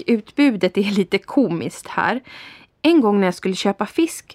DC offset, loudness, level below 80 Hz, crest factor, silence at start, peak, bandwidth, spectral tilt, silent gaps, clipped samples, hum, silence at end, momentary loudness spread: under 0.1%; -19 LUFS; -62 dBFS; 16 dB; 0 s; -4 dBFS; 15 kHz; -5.5 dB/octave; none; under 0.1%; none; 0 s; 10 LU